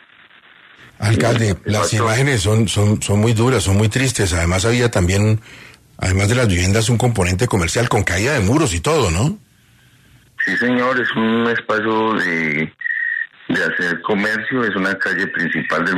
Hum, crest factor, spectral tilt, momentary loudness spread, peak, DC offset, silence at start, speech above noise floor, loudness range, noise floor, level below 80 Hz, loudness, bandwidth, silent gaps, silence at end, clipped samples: none; 14 dB; -5 dB/octave; 4 LU; -2 dBFS; under 0.1%; 1 s; 35 dB; 3 LU; -51 dBFS; -38 dBFS; -17 LUFS; 13.5 kHz; none; 0 s; under 0.1%